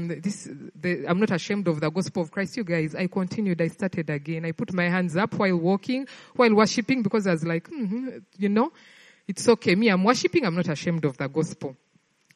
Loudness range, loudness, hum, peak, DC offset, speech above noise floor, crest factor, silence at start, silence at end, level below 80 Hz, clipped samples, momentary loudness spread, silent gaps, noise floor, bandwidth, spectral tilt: 3 LU; -25 LUFS; none; -4 dBFS; under 0.1%; 38 dB; 20 dB; 0 s; 0.6 s; -68 dBFS; under 0.1%; 11 LU; none; -63 dBFS; 11.5 kHz; -6 dB/octave